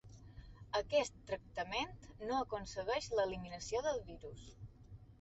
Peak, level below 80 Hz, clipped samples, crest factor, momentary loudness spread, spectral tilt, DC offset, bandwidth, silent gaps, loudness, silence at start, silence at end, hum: -22 dBFS; -60 dBFS; under 0.1%; 20 dB; 21 LU; -2.5 dB/octave; under 0.1%; 8 kHz; none; -40 LUFS; 0.05 s; 0.05 s; none